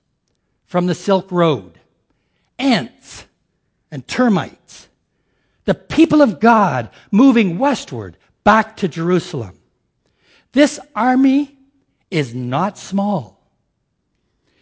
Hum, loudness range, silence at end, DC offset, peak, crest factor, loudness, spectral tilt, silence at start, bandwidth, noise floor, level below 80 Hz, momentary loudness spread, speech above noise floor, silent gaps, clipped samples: none; 7 LU; 1.35 s; under 0.1%; 0 dBFS; 18 dB; -16 LUFS; -6 dB/octave; 0.75 s; 8 kHz; -69 dBFS; -52 dBFS; 17 LU; 54 dB; none; under 0.1%